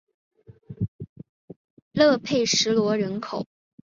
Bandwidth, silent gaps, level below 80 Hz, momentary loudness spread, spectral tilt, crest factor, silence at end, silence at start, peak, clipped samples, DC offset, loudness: 7.8 kHz; 0.88-0.99 s, 1.09-1.16 s, 1.29-1.48 s, 1.56-1.91 s; -58 dBFS; 17 LU; -4 dB/octave; 20 dB; 0.45 s; 0.7 s; -6 dBFS; under 0.1%; under 0.1%; -23 LUFS